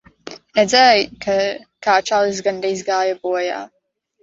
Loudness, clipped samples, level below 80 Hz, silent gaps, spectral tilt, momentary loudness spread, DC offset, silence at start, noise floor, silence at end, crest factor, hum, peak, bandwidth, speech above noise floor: -17 LUFS; under 0.1%; -58 dBFS; none; -2.5 dB/octave; 13 LU; under 0.1%; 0.25 s; -39 dBFS; 0.55 s; 18 dB; none; 0 dBFS; 8 kHz; 22 dB